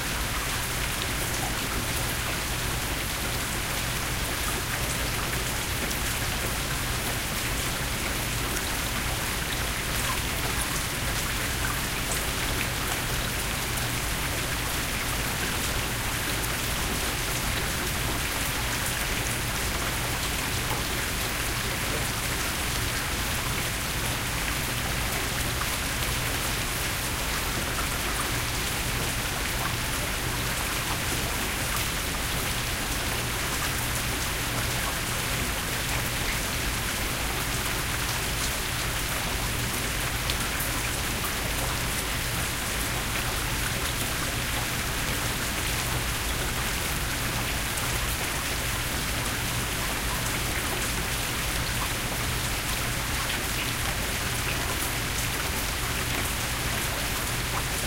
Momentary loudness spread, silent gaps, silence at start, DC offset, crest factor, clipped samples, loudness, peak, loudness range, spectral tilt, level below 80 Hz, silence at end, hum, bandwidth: 1 LU; none; 0 s; 0.1%; 22 dB; under 0.1%; -27 LUFS; -6 dBFS; 0 LU; -2.5 dB/octave; -36 dBFS; 0 s; none; 16 kHz